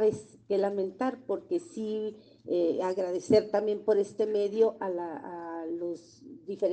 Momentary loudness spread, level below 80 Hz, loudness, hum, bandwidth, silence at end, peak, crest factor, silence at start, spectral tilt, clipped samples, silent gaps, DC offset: 14 LU; -72 dBFS; -30 LUFS; none; 9 kHz; 0 s; -12 dBFS; 18 dB; 0 s; -6.5 dB/octave; under 0.1%; none; under 0.1%